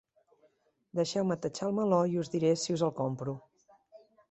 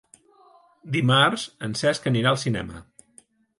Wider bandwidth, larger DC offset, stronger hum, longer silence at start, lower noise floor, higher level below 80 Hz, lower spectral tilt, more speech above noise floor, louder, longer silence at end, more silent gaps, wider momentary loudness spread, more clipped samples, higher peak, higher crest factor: second, 8.4 kHz vs 11.5 kHz; neither; neither; about the same, 0.95 s vs 0.85 s; first, -70 dBFS vs -57 dBFS; second, -72 dBFS vs -56 dBFS; about the same, -6 dB/octave vs -5 dB/octave; first, 40 dB vs 34 dB; second, -31 LUFS vs -22 LUFS; second, 0.35 s vs 0.75 s; neither; about the same, 10 LU vs 12 LU; neither; second, -14 dBFS vs -6 dBFS; about the same, 18 dB vs 18 dB